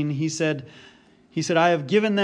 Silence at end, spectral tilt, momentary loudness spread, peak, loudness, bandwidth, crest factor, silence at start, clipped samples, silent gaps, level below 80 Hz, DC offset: 0 s; -5 dB/octave; 12 LU; -8 dBFS; -23 LUFS; 10.5 kHz; 16 dB; 0 s; under 0.1%; none; -70 dBFS; under 0.1%